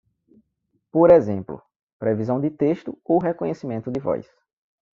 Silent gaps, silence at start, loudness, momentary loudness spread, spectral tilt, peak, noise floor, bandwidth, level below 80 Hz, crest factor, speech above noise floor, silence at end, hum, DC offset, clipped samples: 1.76-1.87 s, 1.93-2.00 s; 0.95 s; -21 LUFS; 15 LU; -9 dB/octave; -2 dBFS; -72 dBFS; 6.8 kHz; -58 dBFS; 20 dB; 52 dB; 0.7 s; none; under 0.1%; under 0.1%